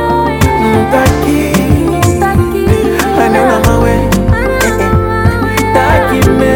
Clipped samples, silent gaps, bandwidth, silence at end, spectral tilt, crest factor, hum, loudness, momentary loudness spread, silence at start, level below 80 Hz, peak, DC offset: 0.4%; none; 19 kHz; 0 s; -6 dB/octave; 10 dB; none; -10 LUFS; 3 LU; 0 s; -20 dBFS; 0 dBFS; under 0.1%